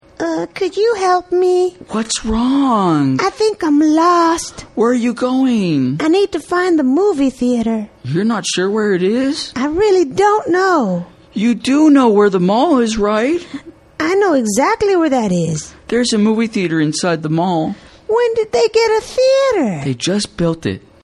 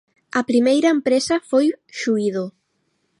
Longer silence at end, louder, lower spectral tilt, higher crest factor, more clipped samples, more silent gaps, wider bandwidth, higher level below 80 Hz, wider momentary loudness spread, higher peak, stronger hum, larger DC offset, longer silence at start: second, 0.25 s vs 0.7 s; first, -15 LUFS vs -19 LUFS; about the same, -5 dB/octave vs -4.5 dB/octave; about the same, 14 dB vs 14 dB; neither; neither; about the same, 12.5 kHz vs 11.5 kHz; first, -44 dBFS vs -68 dBFS; about the same, 8 LU vs 10 LU; first, 0 dBFS vs -6 dBFS; neither; neither; second, 0.2 s vs 0.35 s